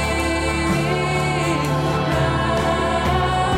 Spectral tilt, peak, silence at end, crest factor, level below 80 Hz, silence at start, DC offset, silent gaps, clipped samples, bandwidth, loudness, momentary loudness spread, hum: -5.5 dB/octave; -8 dBFS; 0 s; 10 dB; -32 dBFS; 0 s; under 0.1%; none; under 0.1%; 16 kHz; -20 LUFS; 1 LU; none